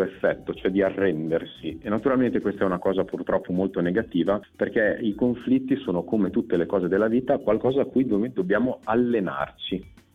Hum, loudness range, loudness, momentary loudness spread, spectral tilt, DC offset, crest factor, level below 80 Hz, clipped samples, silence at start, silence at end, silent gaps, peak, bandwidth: none; 2 LU; -25 LUFS; 6 LU; -8.5 dB/octave; under 0.1%; 14 dB; -54 dBFS; under 0.1%; 0 s; 0.25 s; none; -10 dBFS; 4.7 kHz